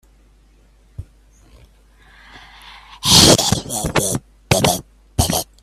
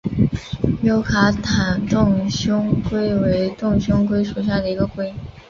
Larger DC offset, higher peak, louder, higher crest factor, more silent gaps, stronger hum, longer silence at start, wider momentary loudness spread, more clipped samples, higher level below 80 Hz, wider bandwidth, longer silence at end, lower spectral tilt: neither; about the same, 0 dBFS vs -2 dBFS; first, -15 LUFS vs -19 LUFS; about the same, 20 dB vs 16 dB; neither; neither; first, 1 s vs 0.05 s; first, 15 LU vs 5 LU; neither; about the same, -36 dBFS vs -36 dBFS; first, 16 kHz vs 7.2 kHz; about the same, 0.2 s vs 0.1 s; second, -3 dB/octave vs -6.5 dB/octave